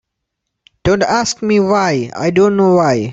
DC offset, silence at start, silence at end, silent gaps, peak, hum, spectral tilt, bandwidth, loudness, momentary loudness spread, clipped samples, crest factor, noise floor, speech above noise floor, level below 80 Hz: under 0.1%; 0.85 s; 0 s; none; -2 dBFS; none; -5.5 dB/octave; 8 kHz; -13 LUFS; 5 LU; under 0.1%; 12 dB; -75 dBFS; 63 dB; -42 dBFS